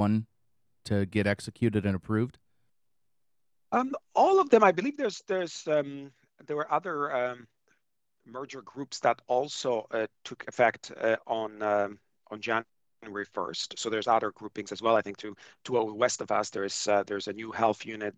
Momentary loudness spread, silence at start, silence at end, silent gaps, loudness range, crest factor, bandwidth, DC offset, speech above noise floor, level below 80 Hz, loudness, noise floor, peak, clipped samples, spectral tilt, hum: 14 LU; 0 s; 0.05 s; none; 6 LU; 22 dB; 11.5 kHz; under 0.1%; 58 dB; -68 dBFS; -29 LUFS; -87 dBFS; -8 dBFS; under 0.1%; -5 dB/octave; none